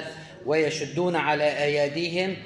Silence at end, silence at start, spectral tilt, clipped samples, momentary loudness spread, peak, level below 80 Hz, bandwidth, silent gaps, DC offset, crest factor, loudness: 0 s; 0 s; -5 dB/octave; under 0.1%; 4 LU; -8 dBFS; -66 dBFS; 11 kHz; none; under 0.1%; 18 dB; -25 LUFS